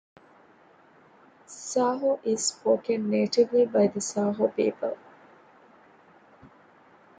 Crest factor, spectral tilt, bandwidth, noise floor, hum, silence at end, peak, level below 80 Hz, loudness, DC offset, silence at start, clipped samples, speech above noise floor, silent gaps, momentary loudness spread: 18 dB; -4.5 dB/octave; 9.6 kHz; -57 dBFS; none; 2.25 s; -10 dBFS; -74 dBFS; -26 LUFS; under 0.1%; 1.5 s; under 0.1%; 32 dB; none; 11 LU